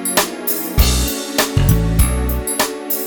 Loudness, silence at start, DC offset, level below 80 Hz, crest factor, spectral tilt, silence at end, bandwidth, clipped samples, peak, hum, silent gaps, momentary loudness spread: -17 LUFS; 0 s; under 0.1%; -20 dBFS; 16 dB; -4 dB/octave; 0 s; over 20 kHz; under 0.1%; 0 dBFS; none; none; 4 LU